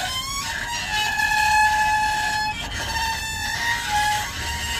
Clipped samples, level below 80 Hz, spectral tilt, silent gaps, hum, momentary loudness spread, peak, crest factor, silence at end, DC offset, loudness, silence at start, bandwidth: under 0.1%; -38 dBFS; -1 dB/octave; none; none; 8 LU; -8 dBFS; 16 dB; 0 s; under 0.1%; -22 LUFS; 0 s; 15.5 kHz